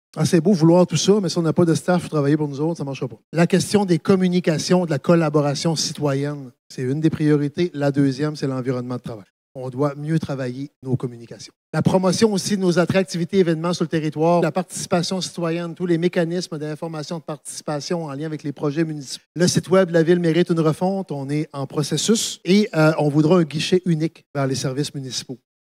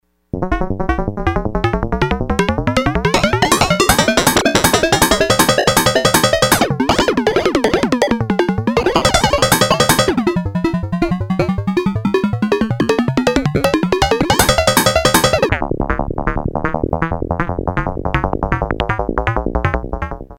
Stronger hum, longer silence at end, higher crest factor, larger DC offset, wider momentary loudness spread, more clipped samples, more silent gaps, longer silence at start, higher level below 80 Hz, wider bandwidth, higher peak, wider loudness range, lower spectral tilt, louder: neither; first, 0.3 s vs 0.05 s; about the same, 18 dB vs 16 dB; neither; first, 12 LU vs 8 LU; neither; first, 3.24-3.32 s, 6.59-6.70 s, 9.30-9.55 s, 10.76-10.82 s, 11.56-11.73 s, 19.26-19.35 s, 24.26-24.34 s vs none; second, 0.15 s vs 0.35 s; second, -62 dBFS vs -28 dBFS; second, 15 kHz vs 19.5 kHz; about the same, -2 dBFS vs 0 dBFS; about the same, 6 LU vs 7 LU; first, -5.5 dB/octave vs -4 dB/octave; second, -20 LUFS vs -15 LUFS